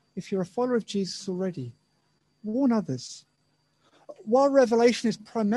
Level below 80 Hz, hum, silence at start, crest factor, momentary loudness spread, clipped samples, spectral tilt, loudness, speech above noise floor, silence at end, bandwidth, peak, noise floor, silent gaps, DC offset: -72 dBFS; none; 0.15 s; 20 dB; 20 LU; under 0.1%; -5.5 dB/octave; -26 LUFS; 45 dB; 0 s; 11.5 kHz; -8 dBFS; -70 dBFS; none; under 0.1%